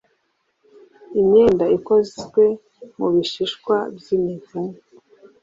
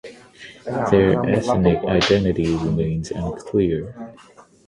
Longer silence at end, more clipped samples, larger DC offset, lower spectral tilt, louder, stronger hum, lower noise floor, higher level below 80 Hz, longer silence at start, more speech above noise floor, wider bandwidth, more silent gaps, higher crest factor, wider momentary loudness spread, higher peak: first, 0.7 s vs 0.55 s; neither; neither; about the same, -6.5 dB/octave vs -6.5 dB/octave; about the same, -19 LUFS vs -20 LUFS; neither; first, -69 dBFS vs -43 dBFS; second, -56 dBFS vs -40 dBFS; first, 1.1 s vs 0.05 s; first, 51 dB vs 24 dB; second, 7.6 kHz vs 11 kHz; neither; about the same, 16 dB vs 20 dB; second, 15 LU vs 19 LU; about the same, -4 dBFS vs -2 dBFS